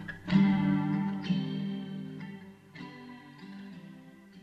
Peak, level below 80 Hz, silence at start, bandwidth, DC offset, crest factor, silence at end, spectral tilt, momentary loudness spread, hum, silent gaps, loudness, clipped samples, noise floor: -12 dBFS; -64 dBFS; 0 s; 6 kHz; under 0.1%; 20 dB; 0 s; -8 dB/octave; 23 LU; none; none; -30 LUFS; under 0.1%; -52 dBFS